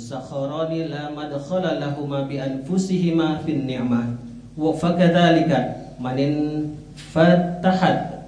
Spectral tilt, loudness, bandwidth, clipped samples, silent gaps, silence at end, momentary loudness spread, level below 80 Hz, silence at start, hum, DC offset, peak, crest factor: -7 dB/octave; -21 LUFS; 10 kHz; under 0.1%; none; 0 s; 13 LU; -50 dBFS; 0 s; none; under 0.1%; -2 dBFS; 18 dB